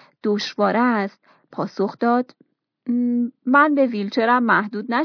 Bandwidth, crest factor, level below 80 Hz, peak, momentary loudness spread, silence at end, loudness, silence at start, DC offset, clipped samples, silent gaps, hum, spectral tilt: 5.4 kHz; 16 dB; -82 dBFS; -4 dBFS; 13 LU; 0 s; -20 LUFS; 0.25 s; under 0.1%; under 0.1%; none; none; -6 dB/octave